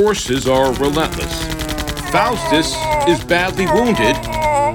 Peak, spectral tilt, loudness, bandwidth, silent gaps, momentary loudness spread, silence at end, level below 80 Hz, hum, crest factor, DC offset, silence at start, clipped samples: 0 dBFS; -4.5 dB/octave; -16 LUFS; 18 kHz; none; 7 LU; 0 s; -30 dBFS; none; 16 dB; under 0.1%; 0 s; under 0.1%